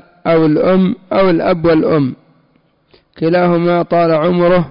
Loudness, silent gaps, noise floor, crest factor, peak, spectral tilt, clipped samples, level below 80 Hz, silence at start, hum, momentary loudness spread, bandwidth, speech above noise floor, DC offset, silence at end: -13 LUFS; none; -55 dBFS; 8 dB; -4 dBFS; -13 dB/octave; under 0.1%; -46 dBFS; 0.25 s; none; 4 LU; 5.4 kHz; 44 dB; under 0.1%; 0 s